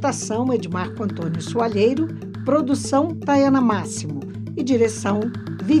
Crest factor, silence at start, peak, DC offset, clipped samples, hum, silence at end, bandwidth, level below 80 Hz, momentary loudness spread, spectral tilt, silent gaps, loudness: 14 dB; 0 s; -6 dBFS; under 0.1%; under 0.1%; none; 0 s; 12 kHz; -58 dBFS; 10 LU; -6 dB/octave; none; -21 LUFS